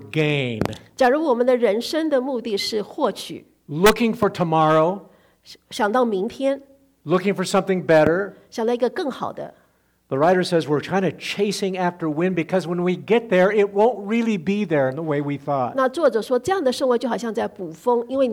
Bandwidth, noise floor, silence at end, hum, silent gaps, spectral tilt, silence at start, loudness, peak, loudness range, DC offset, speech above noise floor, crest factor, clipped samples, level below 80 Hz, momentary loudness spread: over 20 kHz; -62 dBFS; 0 s; none; none; -5.5 dB/octave; 0 s; -21 LUFS; -6 dBFS; 2 LU; under 0.1%; 41 dB; 14 dB; under 0.1%; -52 dBFS; 10 LU